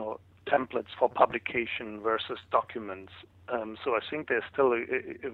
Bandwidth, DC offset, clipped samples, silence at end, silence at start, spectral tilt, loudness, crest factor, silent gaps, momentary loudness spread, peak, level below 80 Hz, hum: 4.7 kHz; under 0.1%; under 0.1%; 0 s; 0 s; -7 dB/octave; -30 LUFS; 24 dB; none; 13 LU; -6 dBFS; -66 dBFS; none